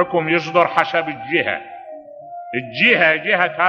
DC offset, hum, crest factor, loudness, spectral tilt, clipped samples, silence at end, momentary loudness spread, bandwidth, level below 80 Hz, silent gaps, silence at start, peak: under 0.1%; none; 18 dB; -17 LUFS; -5.5 dB/octave; under 0.1%; 0 s; 22 LU; 9 kHz; -66 dBFS; none; 0 s; 0 dBFS